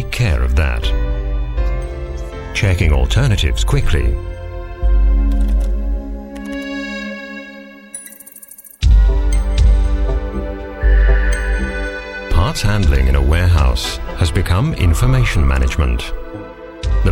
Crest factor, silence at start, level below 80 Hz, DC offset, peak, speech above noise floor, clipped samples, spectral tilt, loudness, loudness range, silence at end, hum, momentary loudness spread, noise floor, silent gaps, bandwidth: 14 dB; 0 s; -16 dBFS; under 0.1%; -2 dBFS; 25 dB; under 0.1%; -5.5 dB/octave; -17 LUFS; 5 LU; 0 s; none; 15 LU; -38 dBFS; none; 14 kHz